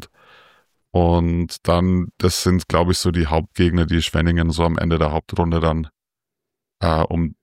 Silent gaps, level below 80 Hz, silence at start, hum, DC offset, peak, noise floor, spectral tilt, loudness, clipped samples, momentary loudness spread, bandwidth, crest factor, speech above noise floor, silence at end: none; -30 dBFS; 0 s; none; under 0.1%; -4 dBFS; -85 dBFS; -6 dB/octave; -19 LUFS; under 0.1%; 4 LU; 16 kHz; 16 dB; 67 dB; 0.1 s